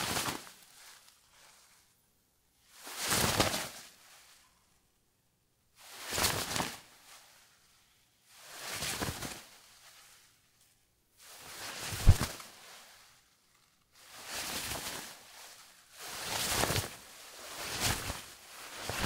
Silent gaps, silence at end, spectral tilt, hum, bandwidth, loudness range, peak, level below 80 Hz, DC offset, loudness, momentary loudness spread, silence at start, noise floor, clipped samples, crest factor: none; 0 s; -3 dB/octave; none; 16 kHz; 7 LU; -8 dBFS; -44 dBFS; under 0.1%; -34 LUFS; 25 LU; 0 s; -74 dBFS; under 0.1%; 30 dB